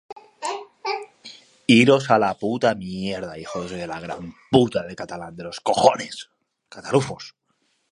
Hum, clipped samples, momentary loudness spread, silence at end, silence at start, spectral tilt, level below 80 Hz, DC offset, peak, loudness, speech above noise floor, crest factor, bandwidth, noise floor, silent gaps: none; under 0.1%; 19 LU; 0.6 s; 0.1 s; -5 dB/octave; -58 dBFS; under 0.1%; 0 dBFS; -22 LUFS; 47 dB; 22 dB; 11.5 kHz; -69 dBFS; none